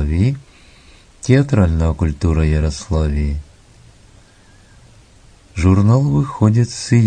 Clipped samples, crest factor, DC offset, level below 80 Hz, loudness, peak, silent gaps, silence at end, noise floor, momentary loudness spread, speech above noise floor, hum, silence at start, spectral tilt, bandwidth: under 0.1%; 16 dB; under 0.1%; -26 dBFS; -16 LUFS; 0 dBFS; none; 0 s; -47 dBFS; 10 LU; 33 dB; none; 0 s; -7.5 dB/octave; 9.6 kHz